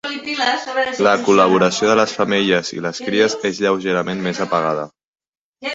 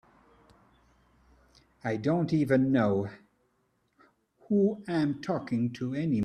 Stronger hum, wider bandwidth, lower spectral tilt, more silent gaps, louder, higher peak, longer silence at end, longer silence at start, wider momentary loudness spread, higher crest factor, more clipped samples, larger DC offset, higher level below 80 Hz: neither; second, 8 kHz vs 12 kHz; second, -4 dB/octave vs -8.5 dB/octave; first, 5.07-5.14 s, 5.28-5.33 s, 5.41-5.54 s vs none; first, -17 LUFS vs -29 LUFS; first, 0 dBFS vs -12 dBFS; about the same, 0 s vs 0 s; second, 0.05 s vs 1.85 s; about the same, 10 LU vs 8 LU; about the same, 16 dB vs 18 dB; neither; neither; first, -60 dBFS vs -66 dBFS